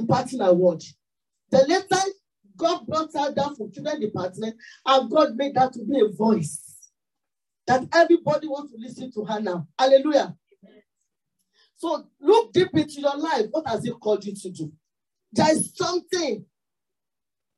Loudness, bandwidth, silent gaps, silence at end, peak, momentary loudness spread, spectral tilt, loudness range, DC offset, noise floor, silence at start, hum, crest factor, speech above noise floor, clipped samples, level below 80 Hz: -23 LUFS; 12.5 kHz; none; 1.15 s; -6 dBFS; 15 LU; -5 dB/octave; 3 LU; under 0.1%; -90 dBFS; 0 s; none; 18 dB; 67 dB; under 0.1%; -72 dBFS